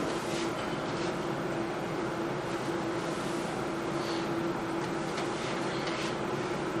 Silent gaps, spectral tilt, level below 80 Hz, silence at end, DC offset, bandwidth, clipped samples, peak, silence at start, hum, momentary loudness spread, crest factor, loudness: none; -5 dB/octave; -58 dBFS; 0 s; under 0.1%; 14 kHz; under 0.1%; -20 dBFS; 0 s; none; 1 LU; 12 dB; -33 LUFS